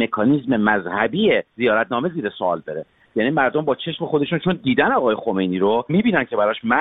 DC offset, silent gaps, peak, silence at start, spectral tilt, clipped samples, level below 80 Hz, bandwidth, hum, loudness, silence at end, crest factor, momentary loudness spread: under 0.1%; none; -2 dBFS; 0 s; -9.5 dB/octave; under 0.1%; -56 dBFS; 4.1 kHz; none; -20 LUFS; 0 s; 18 dB; 6 LU